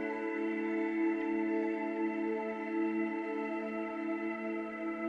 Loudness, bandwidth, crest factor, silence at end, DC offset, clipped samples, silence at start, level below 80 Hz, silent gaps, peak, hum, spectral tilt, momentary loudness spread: -35 LUFS; 5 kHz; 12 dB; 0 s; under 0.1%; under 0.1%; 0 s; -76 dBFS; none; -22 dBFS; none; -7.5 dB/octave; 5 LU